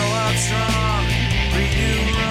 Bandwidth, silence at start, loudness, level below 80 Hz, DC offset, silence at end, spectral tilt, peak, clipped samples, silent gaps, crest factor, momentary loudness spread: 15.5 kHz; 0 s; -19 LUFS; -24 dBFS; under 0.1%; 0 s; -4 dB/octave; -8 dBFS; under 0.1%; none; 12 dB; 1 LU